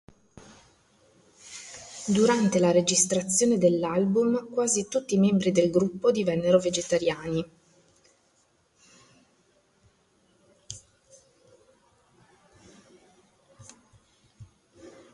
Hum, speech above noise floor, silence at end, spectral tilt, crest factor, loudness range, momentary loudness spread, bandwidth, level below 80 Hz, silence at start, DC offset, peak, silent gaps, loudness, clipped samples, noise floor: none; 43 dB; 0.25 s; -4.5 dB/octave; 20 dB; 9 LU; 20 LU; 11.5 kHz; -64 dBFS; 1.45 s; under 0.1%; -8 dBFS; none; -24 LUFS; under 0.1%; -67 dBFS